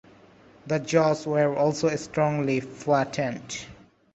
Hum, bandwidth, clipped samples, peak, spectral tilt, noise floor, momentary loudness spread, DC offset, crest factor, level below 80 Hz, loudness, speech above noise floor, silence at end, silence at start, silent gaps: none; 8.2 kHz; under 0.1%; -8 dBFS; -5.5 dB/octave; -53 dBFS; 11 LU; under 0.1%; 18 dB; -62 dBFS; -25 LUFS; 29 dB; 0.4 s; 0.65 s; none